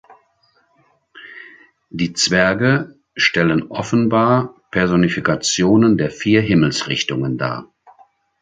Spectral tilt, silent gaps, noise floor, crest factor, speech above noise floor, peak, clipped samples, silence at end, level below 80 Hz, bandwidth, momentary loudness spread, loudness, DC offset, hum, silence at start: -5 dB/octave; none; -60 dBFS; 18 dB; 44 dB; 0 dBFS; under 0.1%; 0.75 s; -48 dBFS; 9.6 kHz; 14 LU; -17 LUFS; under 0.1%; none; 0.1 s